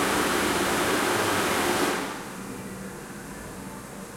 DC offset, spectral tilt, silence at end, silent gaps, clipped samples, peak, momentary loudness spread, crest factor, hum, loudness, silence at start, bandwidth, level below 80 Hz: under 0.1%; -3 dB/octave; 0 s; none; under 0.1%; -12 dBFS; 15 LU; 14 dB; none; -25 LUFS; 0 s; 16.5 kHz; -52 dBFS